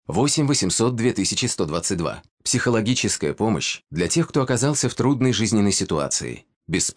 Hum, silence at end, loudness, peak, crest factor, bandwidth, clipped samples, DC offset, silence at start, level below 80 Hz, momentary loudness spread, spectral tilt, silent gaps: none; 0.05 s; -21 LUFS; -8 dBFS; 14 dB; 10 kHz; under 0.1%; under 0.1%; 0.1 s; -50 dBFS; 6 LU; -4 dB/octave; 2.31-2.37 s, 6.56-6.61 s